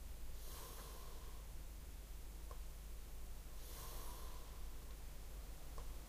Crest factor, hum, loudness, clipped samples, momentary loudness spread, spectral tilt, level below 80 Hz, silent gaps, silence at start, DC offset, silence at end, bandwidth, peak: 12 dB; none; -55 LUFS; under 0.1%; 4 LU; -4 dB/octave; -52 dBFS; none; 0 s; under 0.1%; 0 s; 15.5 kHz; -38 dBFS